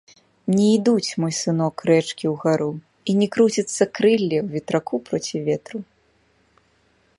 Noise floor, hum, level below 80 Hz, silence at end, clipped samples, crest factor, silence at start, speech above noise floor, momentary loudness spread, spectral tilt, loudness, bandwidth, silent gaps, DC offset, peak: -62 dBFS; none; -66 dBFS; 1.35 s; under 0.1%; 18 dB; 0.45 s; 41 dB; 9 LU; -5.5 dB/octave; -21 LUFS; 11.5 kHz; none; under 0.1%; -2 dBFS